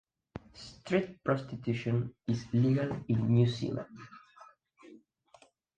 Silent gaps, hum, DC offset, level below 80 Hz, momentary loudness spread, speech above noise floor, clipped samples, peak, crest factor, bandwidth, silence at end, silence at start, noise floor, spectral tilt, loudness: none; none; under 0.1%; -62 dBFS; 22 LU; 32 dB; under 0.1%; -14 dBFS; 20 dB; 8.6 kHz; 0.8 s; 0.35 s; -63 dBFS; -8 dB/octave; -32 LUFS